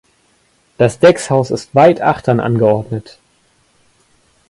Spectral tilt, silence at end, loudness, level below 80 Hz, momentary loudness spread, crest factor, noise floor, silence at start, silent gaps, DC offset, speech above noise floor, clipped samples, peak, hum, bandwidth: -6.5 dB/octave; 1.5 s; -13 LUFS; -50 dBFS; 8 LU; 14 dB; -56 dBFS; 0.8 s; none; under 0.1%; 44 dB; under 0.1%; 0 dBFS; none; 11.5 kHz